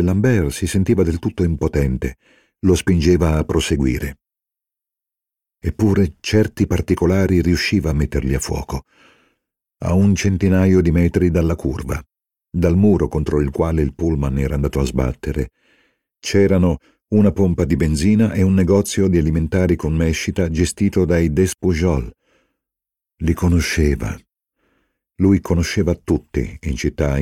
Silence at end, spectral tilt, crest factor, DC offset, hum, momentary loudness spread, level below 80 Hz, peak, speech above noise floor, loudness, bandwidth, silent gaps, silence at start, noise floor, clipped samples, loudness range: 0 s; -6.5 dB/octave; 16 dB; under 0.1%; none; 10 LU; -30 dBFS; -2 dBFS; 70 dB; -18 LUFS; 15.5 kHz; none; 0 s; -87 dBFS; under 0.1%; 4 LU